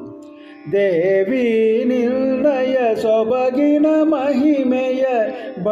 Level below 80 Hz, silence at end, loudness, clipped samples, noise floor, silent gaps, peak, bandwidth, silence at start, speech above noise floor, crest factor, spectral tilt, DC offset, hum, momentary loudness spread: -62 dBFS; 0 s; -17 LUFS; under 0.1%; -38 dBFS; none; -6 dBFS; 7.6 kHz; 0 s; 22 dB; 12 dB; -7 dB/octave; under 0.1%; none; 5 LU